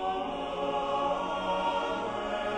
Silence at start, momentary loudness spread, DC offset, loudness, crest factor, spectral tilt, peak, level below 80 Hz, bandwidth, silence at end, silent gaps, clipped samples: 0 s; 3 LU; under 0.1%; -31 LUFS; 12 dB; -4.5 dB/octave; -18 dBFS; -54 dBFS; 10 kHz; 0 s; none; under 0.1%